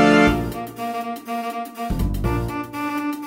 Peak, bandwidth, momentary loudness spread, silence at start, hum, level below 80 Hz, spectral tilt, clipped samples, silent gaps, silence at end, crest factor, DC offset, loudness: -2 dBFS; 16 kHz; 12 LU; 0 s; none; -32 dBFS; -6 dB/octave; under 0.1%; none; 0 s; 18 dB; under 0.1%; -23 LUFS